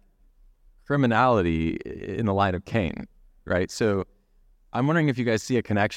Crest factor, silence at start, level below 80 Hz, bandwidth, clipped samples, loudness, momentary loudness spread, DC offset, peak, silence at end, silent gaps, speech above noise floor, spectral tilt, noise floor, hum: 18 dB; 0.9 s; -48 dBFS; 15.5 kHz; under 0.1%; -25 LUFS; 13 LU; under 0.1%; -8 dBFS; 0 s; none; 36 dB; -6.5 dB/octave; -59 dBFS; none